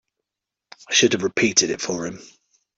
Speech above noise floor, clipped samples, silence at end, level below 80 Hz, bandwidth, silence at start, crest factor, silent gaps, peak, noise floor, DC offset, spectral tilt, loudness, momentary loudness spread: 65 dB; under 0.1%; 0.5 s; -62 dBFS; 8 kHz; 0.9 s; 22 dB; none; -2 dBFS; -86 dBFS; under 0.1%; -2 dB/octave; -19 LUFS; 11 LU